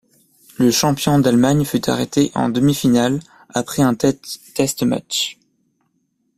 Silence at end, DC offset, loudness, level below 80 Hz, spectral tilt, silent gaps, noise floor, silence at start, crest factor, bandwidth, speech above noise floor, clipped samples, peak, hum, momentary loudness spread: 1.05 s; under 0.1%; -17 LUFS; -48 dBFS; -5 dB/octave; none; -67 dBFS; 0.6 s; 18 dB; 16 kHz; 50 dB; under 0.1%; 0 dBFS; none; 10 LU